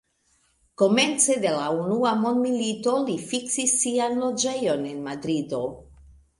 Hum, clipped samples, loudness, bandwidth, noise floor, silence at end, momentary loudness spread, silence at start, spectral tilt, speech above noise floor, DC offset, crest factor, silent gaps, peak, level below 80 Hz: none; under 0.1%; -24 LUFS; 11.5 kHz; -67 dBFS; 0.6 s; 9 LU; 0.8 s; -3 dB/octave; 43 dB; under 0.1%; 20 dB; none; -6 dBFS; -60 dBFS